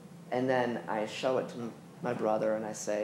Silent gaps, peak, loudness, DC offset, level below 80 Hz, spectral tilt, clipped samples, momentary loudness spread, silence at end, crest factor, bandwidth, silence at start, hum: none; -16 dBFS; -33 LUFS; under 0.1%; -82 dBFS; -5 dB/octave; under 0.1%; 10 LU; 0 s; 18 dB; 14 kHz; 0 s; none